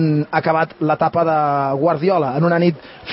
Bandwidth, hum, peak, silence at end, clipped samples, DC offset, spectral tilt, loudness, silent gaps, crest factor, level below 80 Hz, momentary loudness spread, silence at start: 5.8 kHz; none; -2 dBFS; 0 s; under 0.1%; under 0.1%; -12 dB/octave; -17 LUFS; none; 16 dB; -56 dBFS; 3 LU; 0 s